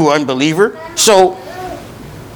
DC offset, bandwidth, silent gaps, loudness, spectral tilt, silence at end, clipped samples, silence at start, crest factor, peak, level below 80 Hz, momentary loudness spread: under 0.1%; over 20 kHz; none; -11 LUFS; -3.5 dB/octave; 0 s; 0.3%; 0 s; 14 dB; 0 dBFS; -46 dBFS; 21 LU